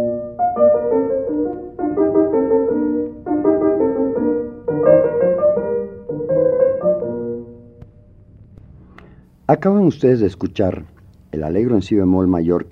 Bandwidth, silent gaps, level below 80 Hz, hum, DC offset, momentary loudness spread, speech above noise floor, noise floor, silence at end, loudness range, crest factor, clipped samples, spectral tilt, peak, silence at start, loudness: 7.4 kHz; none; -46 dBFS; none; under 0.1%; 10 LU; 29 dB; -45 dBFS; 0.05 s; 5 LU; 18 dB; under 0.1%; -9.5 dB/octave; 0 dBFS; 0 s; -17 LUFS